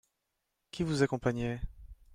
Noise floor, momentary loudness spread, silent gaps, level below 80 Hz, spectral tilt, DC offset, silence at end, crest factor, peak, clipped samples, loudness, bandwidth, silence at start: -83 dBFS; 17 LU; none; -50 dBFS; -6.5 dB/octave; under 0.1%; 0.2 s; 22 dB; -14 dBFS; under 0.1%; -33 LUFS; 14.5 kHz; 0.75 s